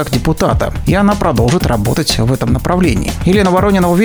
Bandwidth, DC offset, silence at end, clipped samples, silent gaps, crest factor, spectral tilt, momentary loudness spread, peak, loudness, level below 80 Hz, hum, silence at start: over 20 kHz; under 0.1%; 0 s; under 0.1%; none; 12 dB; -6 dB/octave; 4 LU; 0 dBFS; -13 LUFS; -24 dBFS; none; 0 s